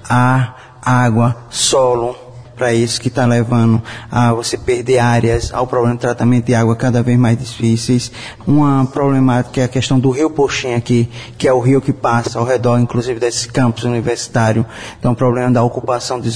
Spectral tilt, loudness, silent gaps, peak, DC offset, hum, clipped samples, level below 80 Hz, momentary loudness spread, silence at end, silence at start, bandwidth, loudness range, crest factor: -6 dB/octave; -15 LUFS; none; -2 dBFS; 0.6%; none; under 0.1%; -38 dBFS; 6 LU; 0 s; 0 s; 11 kHz; 2 LU; 12 dB